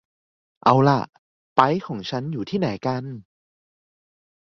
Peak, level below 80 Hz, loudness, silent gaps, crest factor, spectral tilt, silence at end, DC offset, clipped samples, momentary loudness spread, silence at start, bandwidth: -2 dBFS; -60 dBFS; -22 LUFS; 1.18-1.56 s; 22 dB; -7.5 dB/octave; 1.2 s; under 0.1%; under 0.1%; 15 LU; 0.65 s; 7.2 kHz